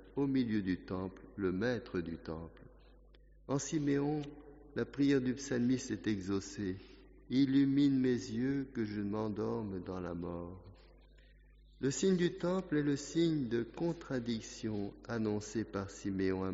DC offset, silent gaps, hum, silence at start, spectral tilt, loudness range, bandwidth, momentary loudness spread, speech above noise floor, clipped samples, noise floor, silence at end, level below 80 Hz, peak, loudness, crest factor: under 0.1%; none; none; 0 s; -6.5 dB/octave; 6 LU; 7.6 kHz; 11 LU; 26 dB; under 0.1%; -61 dBFS; 0 s; -60 dBFS; -20 dBFS; -36 LUFS; 16 dB